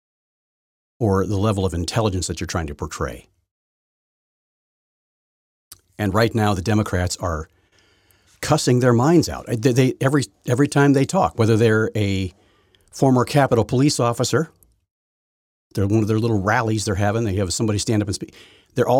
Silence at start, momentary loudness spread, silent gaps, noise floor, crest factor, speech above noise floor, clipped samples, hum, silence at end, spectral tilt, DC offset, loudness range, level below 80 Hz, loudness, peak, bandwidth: 1 s; 11 LU; 3.51-5.71 s, 14.91-15.71 s; -59 dBFS; 18 dB; 40 dB; under 0.1%; none; 0 s; -6 dB/octave; under 0.1%; 9 LU; -44 dBFS; -20 LUFS; -2 dBFS; 16 kHz